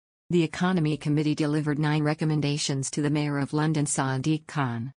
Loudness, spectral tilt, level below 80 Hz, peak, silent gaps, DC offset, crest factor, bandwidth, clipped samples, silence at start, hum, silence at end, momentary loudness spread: -26 LUFS; -5.5 dB/octave; -62 dBFS; -12 dBFS; none; under 0.1%; 14 dB; 10 kHz; under 0.1%; 0.3 s; none; 0.1 s; 3 LU